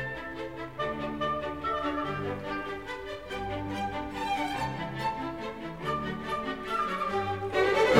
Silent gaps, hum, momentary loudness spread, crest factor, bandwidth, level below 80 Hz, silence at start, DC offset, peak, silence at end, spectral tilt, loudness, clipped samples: none; none; 8 LU; 24 dB; 16 kHz; -52 dBFS; 0 s; 0.2%; -6 dBFS; 0 s; -5.5 dB/octave; -32 LUFS; under 0.1%